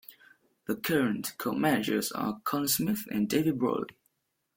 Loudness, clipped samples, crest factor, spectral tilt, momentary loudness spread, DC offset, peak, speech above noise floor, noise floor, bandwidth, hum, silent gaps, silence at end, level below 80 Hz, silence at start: -29 LUFS; under 0.1%; 18 dB; -4.5 dB/octave; 7 LU; under 0.1%; -12 dBFS; 47 dB; -76 dBFS; 17 kHz; none; none; 0.65 s; -66 dBFS; 0.1 s